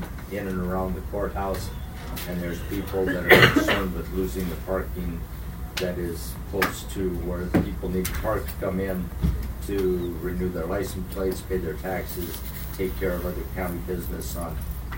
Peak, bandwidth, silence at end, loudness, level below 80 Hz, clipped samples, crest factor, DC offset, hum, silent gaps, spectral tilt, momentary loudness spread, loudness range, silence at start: 0 dBFS; 16.5 kHz; 0 s; -26 LUFS; -34 dBFS; under 0.1%; 26 dB; under 0.1%; none; none; -5.5 dB/octave; 7 LU; 7 LU; 0 s